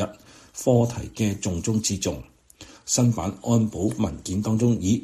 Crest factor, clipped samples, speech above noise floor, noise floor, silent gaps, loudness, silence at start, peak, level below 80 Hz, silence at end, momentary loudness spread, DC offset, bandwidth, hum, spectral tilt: 18 dB; under 0.1%; 25 dB; -48 dBFS; none; -24 LUFS; 0 s; -6 dBFS; -48 dBFS; 0 s; 8 LU; under 0.1%; 14.5 kHz; none; -5.5 dB/octave